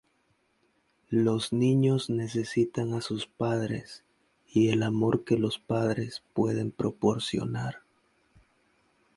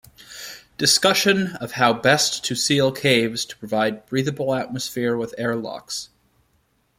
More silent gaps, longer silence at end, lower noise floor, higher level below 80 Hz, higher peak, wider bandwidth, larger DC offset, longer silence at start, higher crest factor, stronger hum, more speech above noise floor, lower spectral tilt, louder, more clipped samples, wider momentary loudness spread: neither; first, 1.4 s vs 0.95 s; first, -71 dBFS vs -65 dBFS; about the same, -62 dBFS vs -60 dBFS; second, -10 dBFS vs -2 dBFS; second, 11.5 kHz vs 16.5 kHz; neither; first, 1.1 s vs 0.2 s; about the same, 18 dB vs 20 dB; neither; about the same, 44 dB vs 44 dB; first, -6.5 dB/octave vs -3 dB/octave; second, -28 LUFS vs -20 LUFS; neither; second, 9 LU vs 14 LU